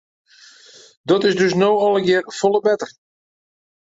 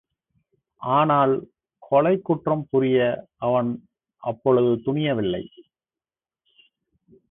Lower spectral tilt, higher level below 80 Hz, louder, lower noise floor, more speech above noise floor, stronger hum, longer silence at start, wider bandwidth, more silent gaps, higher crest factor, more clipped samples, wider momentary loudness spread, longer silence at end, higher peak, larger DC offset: second, -5 dB/octave vs -11.5 dB/octave; about the same, -64 dBFS vs -60 dBFS; first, -17 LUFS vs -22 LUFS; second, -47 dBFS vs under -90 dBFS; second, 30 dB vs over 69 dB; neither; first, 1.05 s vs 0.8 s; first, 8 kHz vs 3.9 kHz; neither; about the same, 16 dB vs 18 dB; neither; second, 8 LU vs 13 LU; second, 0.95 s vs 1.7 s; first, -2 dBFS vs -6 dBFS; neither